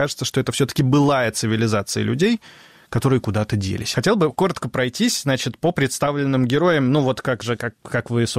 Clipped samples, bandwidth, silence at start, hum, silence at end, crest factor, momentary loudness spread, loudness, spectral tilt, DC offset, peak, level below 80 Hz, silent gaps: under 0.1%; 16 kHz; 0 s; none; 0 s; 12 dB; 6 LU; -20 LUFS; -5 dB/octave; under 0.1%; -8 dBFS; -50 dBFS; none